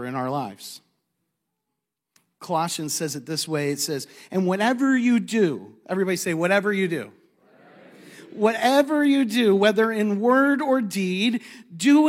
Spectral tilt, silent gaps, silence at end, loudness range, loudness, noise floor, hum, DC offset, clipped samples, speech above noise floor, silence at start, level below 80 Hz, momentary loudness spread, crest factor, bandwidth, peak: -4.5 dB/octave; none; 0 s; 8 LU; -22 LUFS; -82 dBFS; none; under 0.1%; under 0.1%; 60 dB; 0 s; -80 dBFS; 12 LU; 18 dB; 16 kHz; -4 dBFS